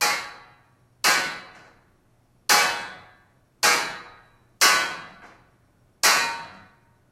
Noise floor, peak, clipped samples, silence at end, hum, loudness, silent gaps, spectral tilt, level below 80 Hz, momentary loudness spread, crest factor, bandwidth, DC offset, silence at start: -62 dBFS; -4 dBFS; under 0.1%; 0.55 s; none; -21 LUFS; none; 1 dB/octave; -66 dBFS; 20 LU; 22 dB; 16 kHz; under 0.1%; 0 s